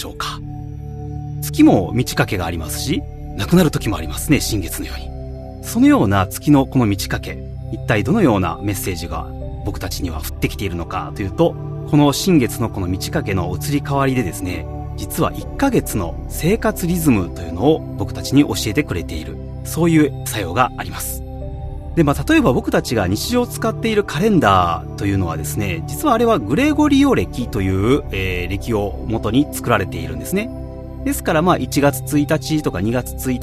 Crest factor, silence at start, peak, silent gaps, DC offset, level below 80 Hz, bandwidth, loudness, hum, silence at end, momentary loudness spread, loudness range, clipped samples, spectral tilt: 18 dB; 0 s; 0 dBFS; none; under 0.1%; -32 dBFS; 14 kHz; -18 LUFS; none; 0 s; 13 LU; 4 LU; under 0.1%; -5.5 dB/octave